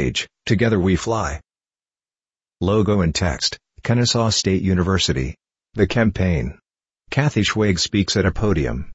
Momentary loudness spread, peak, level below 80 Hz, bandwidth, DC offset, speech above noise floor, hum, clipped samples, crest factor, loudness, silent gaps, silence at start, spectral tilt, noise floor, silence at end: 8 LU; -2 dBFS; -36 dBFS; 8.2 kHz; under 0.1%; over 71 dB; none; under 0.1%; 18 dB; -19 LUFS; none; 0 s; -5 dB/octave; under -90 dBFS; 0 s